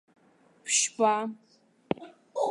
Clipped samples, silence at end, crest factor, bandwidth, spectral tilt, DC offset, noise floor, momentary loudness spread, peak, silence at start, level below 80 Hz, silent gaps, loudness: under 0.1%; 0 s; 22 dB; 11.5 kHz; -1.5 dB/octave; under 0.1%; -62 dBFS; 14 LU; -10 dBFS; 0.65 s; -72 dBFS; none; -28 LUFS